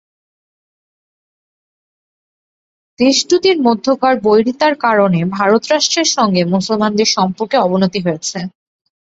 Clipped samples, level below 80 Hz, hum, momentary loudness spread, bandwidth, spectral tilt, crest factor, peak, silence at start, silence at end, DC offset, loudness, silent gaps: under 0.1%; -56 dBFS; none; 5 LU; 8 kHz; -4 dB/octave; 16 dB; 0 dBFS; 3 s; 0.6 s; under 0.1%; -13 LUFS; none